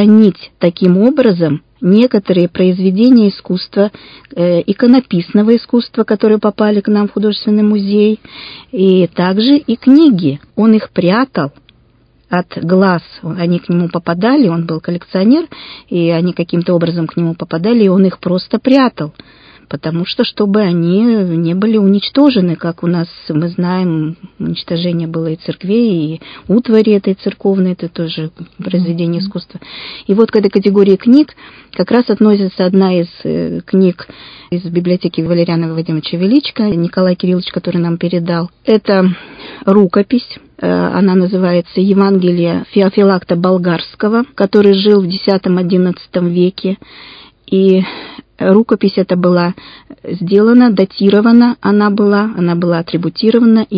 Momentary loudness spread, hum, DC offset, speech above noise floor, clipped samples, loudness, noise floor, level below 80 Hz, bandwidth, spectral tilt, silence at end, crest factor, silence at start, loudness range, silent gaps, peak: 10 LU; none; under 0.1%; 39 dB; 0.3%; -12 LUFS; -50 dBFS; -52 dBFS; 5.2 kHz; -10 dB/octave; 0 s; 12 dB; 0 s; 4 LU; none; 0 dBFS